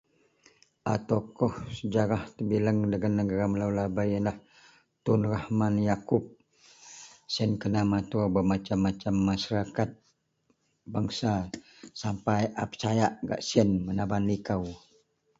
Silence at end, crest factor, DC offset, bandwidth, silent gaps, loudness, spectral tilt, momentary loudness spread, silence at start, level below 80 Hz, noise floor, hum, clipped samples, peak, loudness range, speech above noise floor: 0.6 s; 20 dB; under 0.1%; 7.8 kHz; none; -29 LUFS; -6.5 dB/octave; 10 LU; 0.85 s; -52 dBFS; -73 dBFS; none; under 0.1%; -8 dBFS; 3 LU; 45 dB